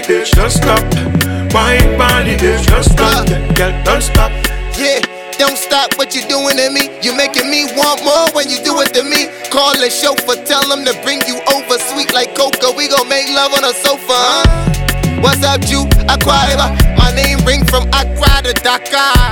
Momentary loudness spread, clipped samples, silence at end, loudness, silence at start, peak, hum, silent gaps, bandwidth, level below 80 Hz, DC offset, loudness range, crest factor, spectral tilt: 4 LU; under 0.1%; 0 s; -11 LUFS; 0 s; 0 dBFS; none; none; 19.5 kHz; -18 dBFS; 0.2%; 2 LU; 12 dB; -3.5 dB/octave